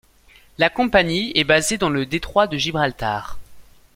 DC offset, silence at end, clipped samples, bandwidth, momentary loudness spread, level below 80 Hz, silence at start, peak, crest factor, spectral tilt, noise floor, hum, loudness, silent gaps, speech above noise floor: under 0.1%; 0.35 s; under 0.1%; 16.5 kHz; 9 LU; -42 dBFS; 0.6 s; -2 dBFS; 20 dB; -3.5 dB/octave; -51 dBFS; none; -19 LUFS; none; 32 dB